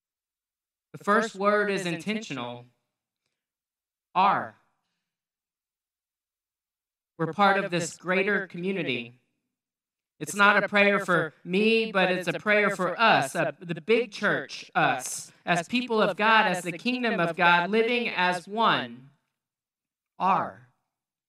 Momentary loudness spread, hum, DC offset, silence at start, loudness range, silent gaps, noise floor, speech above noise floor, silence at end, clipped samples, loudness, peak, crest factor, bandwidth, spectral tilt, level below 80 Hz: 13 LU; none; under 0.1%; 0.95 s; 9 LU; none; under -90 dBFS; over 65 dB; 0.75 s; under 0.1%; -25 LUFS; -2 dBFS; 24 dB; 15 kHz; -4 dB/octave; -82 dBFS